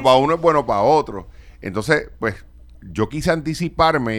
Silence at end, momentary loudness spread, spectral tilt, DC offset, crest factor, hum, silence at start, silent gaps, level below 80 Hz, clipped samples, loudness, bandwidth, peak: 0 s; 15 LU; -5.5 dB/octave; under 0.1%; 18 dB; none; 0 s; none; -40 dBFS; under 0.1%; -19 LUFS; 19 kHz; 0 dBFS